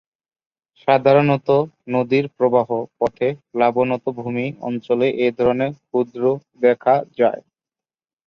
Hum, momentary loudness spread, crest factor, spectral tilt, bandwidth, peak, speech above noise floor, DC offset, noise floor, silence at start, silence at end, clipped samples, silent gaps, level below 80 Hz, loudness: none; 9 LU; 18 dB; -8.5 dB/octave; 6.4 kHz; -2 dBFS; over 72 dB; under 0.1%; under -90 dBFS; 0.85 s; 0.85 s; under 0.1%; none; -60 dBFS; -19 LUFS